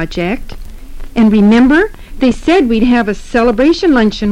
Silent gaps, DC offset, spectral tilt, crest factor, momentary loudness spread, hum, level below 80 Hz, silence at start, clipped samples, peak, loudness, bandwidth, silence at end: none; under 0.1%; -6.5 dB/octave; 8 dB; 11 LU; none; -26 dBFS; 0 s; under 0.1%; -2 dBFS; -11 LUFS; 11 kHz; 0 s